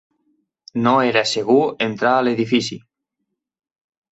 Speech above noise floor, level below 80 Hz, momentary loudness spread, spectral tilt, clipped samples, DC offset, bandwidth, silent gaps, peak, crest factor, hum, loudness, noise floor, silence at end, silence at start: 60 dB; -64 dBFS; 10 LU; -4.5 dB/octave; under 0.1%; under 0.1%; 8.2 kHz; none; -2 dBFS; 18 dB; none; -18 LUFS; -78 dBFS; 1.35 s; 0.75 s